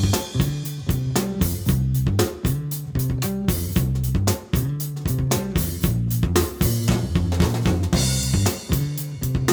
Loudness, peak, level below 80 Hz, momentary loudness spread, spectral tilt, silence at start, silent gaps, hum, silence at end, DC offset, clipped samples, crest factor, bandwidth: -23 LUFS; -6 dBFS; -32 dBFS; 5 LU; -5.5 dB/octave; 0 s; none; none; 0 s; under 0.1%; under 0.1%; 16 dB; over 20 kHz